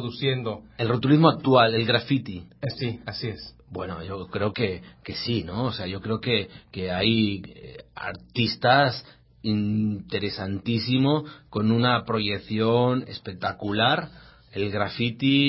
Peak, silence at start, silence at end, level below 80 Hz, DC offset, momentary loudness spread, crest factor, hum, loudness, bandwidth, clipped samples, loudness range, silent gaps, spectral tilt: -2 dBFS; 0 s; 0 s; -52 dBFS; under 0.1%; 16 LU; 22 dB; none; -25 LUFS; 5.8 kHz; under 0.1%; 7 LU; none; -10 dB/octave